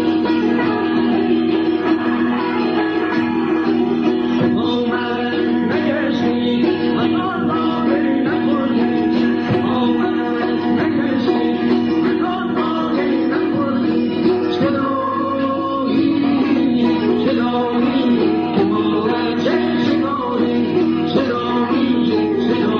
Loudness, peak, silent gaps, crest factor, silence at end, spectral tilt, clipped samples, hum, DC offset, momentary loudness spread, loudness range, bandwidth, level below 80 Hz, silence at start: -17 LUFS; -4 dBFS; none; 12 dB; 0 s; -7.5 dB/octave; under 0.1%; none; under 0.1%; 2 LU; 1 LU; 6.4 kHz; -54 dBFS; 0 s